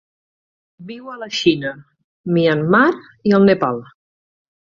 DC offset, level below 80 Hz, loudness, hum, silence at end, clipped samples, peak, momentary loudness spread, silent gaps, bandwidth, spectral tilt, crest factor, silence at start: under 0.1%; -58 dBFS; -16 LUFS; none; 0.85 s; under 0.1%; -2 dBFS; 19 LU; 2.04-2.24 s; 7.4 kHz; -6.5 dB/octave; 18 dB; 0.8 s